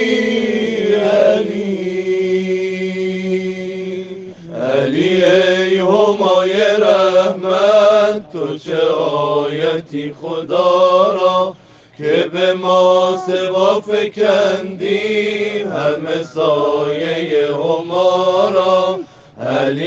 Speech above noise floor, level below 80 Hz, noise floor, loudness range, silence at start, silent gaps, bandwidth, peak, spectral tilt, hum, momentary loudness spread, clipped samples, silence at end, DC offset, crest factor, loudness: 24 dB; -60 dBFS; -39 dBFS; 4 LU; 0 s; none; 8 kHz; 0 dBFS; -5.5 dB/octave; none; 11 LU; under 0.1%; 0 s; under 0.1%; 14 dB; -15 LUFS